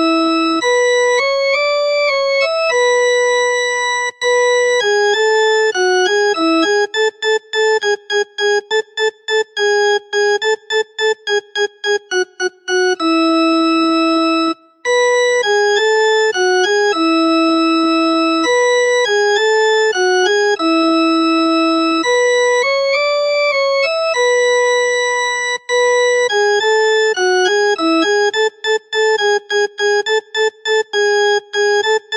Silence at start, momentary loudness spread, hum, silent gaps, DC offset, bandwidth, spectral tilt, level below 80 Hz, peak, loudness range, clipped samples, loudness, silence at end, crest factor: 0 s; 5 LU; none; none; under 0.1%; 11 kHz; -0.5 dB/octave; -74 dBFS; -2 dBFS; 3 LU; under 0.1%; -14 LUFS; 0 s; 12 dB